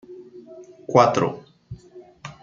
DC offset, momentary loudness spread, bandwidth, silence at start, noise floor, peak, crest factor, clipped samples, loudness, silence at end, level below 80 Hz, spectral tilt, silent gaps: under 0.1%; 26 LU; 7.6 kHz; 0.1 s; -47 dBFS; -2 dBFS; 22 dB; under 0.1%; -19 LUFS; 0.1 s; -60 dBFS; -6 dB/octave; none